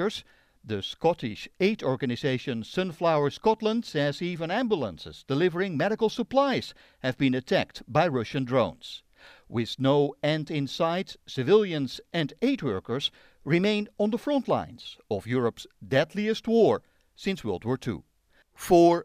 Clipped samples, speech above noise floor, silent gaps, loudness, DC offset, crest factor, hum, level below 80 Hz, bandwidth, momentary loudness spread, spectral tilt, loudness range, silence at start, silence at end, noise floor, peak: under 0.1%; 37 dB; none; -27 LUFS; under 0.1%; 18 dB; none; -60 dBFS; 15.5 kHz; 11 LU; -6 dB/octave; 2 LU; 0 s; 0 s; -64 dBFS; -8 dBFS